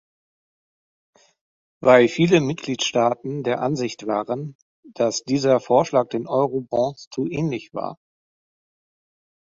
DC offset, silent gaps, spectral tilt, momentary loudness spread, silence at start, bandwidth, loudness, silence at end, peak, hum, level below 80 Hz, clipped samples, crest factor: under 0.1%; 4.55-4.83 s, 7.07-7.11 s; -5.5 dB/octave; 13 LU; 1.8 s; 7.6 kHz; -21 LUFS; 1.6 s; -2 dBFS; none; -62 dBFS; under 0.1%; 22 dB